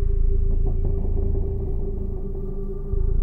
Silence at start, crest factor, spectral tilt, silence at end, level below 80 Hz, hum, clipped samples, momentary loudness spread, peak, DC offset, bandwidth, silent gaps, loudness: 0 s; 10 dB; -12.5 dB/octave; 0 s; -22 dBFS; none; under 0.1%; 7 LU; -12 dBFS; under 0.1%; 1.3 kHz; none; -28 LUFS